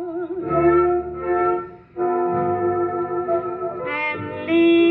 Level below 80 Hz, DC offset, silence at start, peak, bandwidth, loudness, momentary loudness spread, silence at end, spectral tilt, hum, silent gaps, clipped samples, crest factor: -50 dBFS; under 0.1%; 0 s; -6 dBFS; 4.1 kHz; -21 LUFS; 11 LU; 0 s; -9.5 dB/octave; none; none; under 0.1%; 14 dB